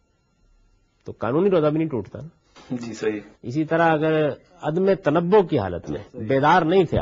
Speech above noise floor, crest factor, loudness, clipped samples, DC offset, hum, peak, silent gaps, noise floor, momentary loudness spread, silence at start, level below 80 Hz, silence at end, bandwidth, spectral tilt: 42 dB; 18 dB; -21 LUFS; under 0.1%; under 0.1%; none; -4 dBFS; none; -63 dBFS; 15 LU; 1.05 s; -54 dBFS; 0 s; 7.6 kHz; -7.5 dB/octave